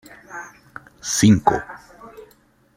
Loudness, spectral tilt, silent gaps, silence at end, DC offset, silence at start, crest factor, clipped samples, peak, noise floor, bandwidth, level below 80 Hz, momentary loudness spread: -17 LUFS; -4.5 dB/octave; none; 0.55 s; under 0.1%; 0.3 s; 20 dB; under 0.1%; -2 dBFS; -56 dBFS; 16 kHz; -50 dBFS; 26 LU